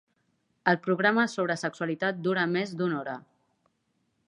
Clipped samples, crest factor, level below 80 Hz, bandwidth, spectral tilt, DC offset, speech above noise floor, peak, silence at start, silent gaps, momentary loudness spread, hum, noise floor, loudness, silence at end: under 0.1%; 24 dB; -80 dBFS; 11 kHz; -5.5 dB/octave; under 0.1%; 47 dB; -6 dBFS; 0.65 s; none; 8 LU; none; -75 dBFS; -28 LUFS; 1.05 s